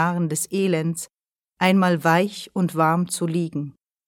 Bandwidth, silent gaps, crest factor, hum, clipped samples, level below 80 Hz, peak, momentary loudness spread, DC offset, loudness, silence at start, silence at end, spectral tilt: 17 kHz; none; 18 dB; none; under 0.1%; -68 dBFS; -4 dBFS; 12 LU; under 0.1%; -22 LUFS; 0 s; 0.35 s; -5.5 dB/octave